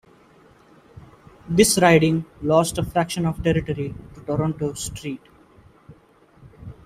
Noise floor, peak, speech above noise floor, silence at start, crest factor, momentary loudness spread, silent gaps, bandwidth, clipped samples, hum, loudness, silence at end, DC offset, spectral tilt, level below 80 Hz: -54 dBFS; -2 dBFS; 33 dB; 1.45 s; 22 dB; 18 LU; none; 16 kHz; under 0.1%; none; -21 LUFS; 0.15 s; under 0.1%; -5 dB/octave; -46 dBFS